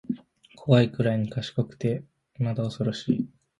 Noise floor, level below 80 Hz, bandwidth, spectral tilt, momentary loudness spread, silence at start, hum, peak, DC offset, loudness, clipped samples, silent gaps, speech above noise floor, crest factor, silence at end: -52 dBFS; -60 dBFS; 10.5 kHz; -8 dB/octave; 13 LU; 0.1 s; none; -6 dBFS; under 0.1%; -27 LUFS; under 0.1%; none; 28 dB; 22 dB; 0.3 s